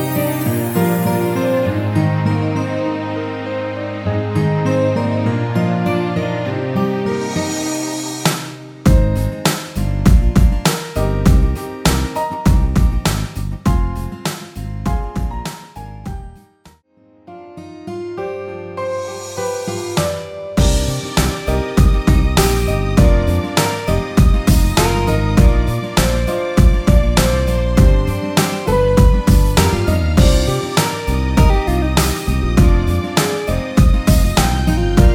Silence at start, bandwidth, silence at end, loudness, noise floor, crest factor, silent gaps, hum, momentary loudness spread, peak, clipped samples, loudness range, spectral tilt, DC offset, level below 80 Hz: 0 s; 17.5 kHz; 0 s; -16 LUFS; -51 dBFS; 14 dB; none; none; 11 LU; 0 dBFS; under 0.1%; 10 LU; -5.5 dB/octave; under 0.1%; -18 dBFS